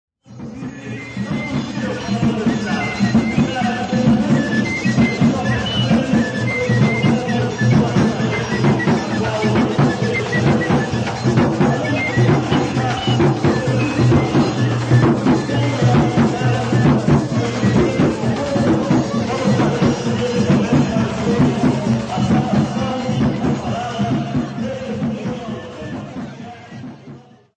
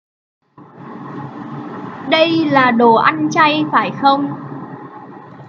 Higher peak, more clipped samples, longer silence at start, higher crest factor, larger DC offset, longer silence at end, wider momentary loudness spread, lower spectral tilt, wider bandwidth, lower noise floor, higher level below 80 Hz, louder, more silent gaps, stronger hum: about the same, -2 dBFS vs 0 dBFS; neither; second, 0.3 s vs 0.6 s; about the same, 14 dB vs 16 dB; neither; first, 0.35 s vs 0 s; second, 10 LU vs 22 LU; about the same, -6.5 dB/octave vs -5.5 dB/octave; first, 9.6 kHz vs 7 kHz; about the same, -40 dBFS vs -37 dBFS; first, -40 dBFS vs -66 dBFS; second, -17 LUFS vs -13 LUFS; neither; neither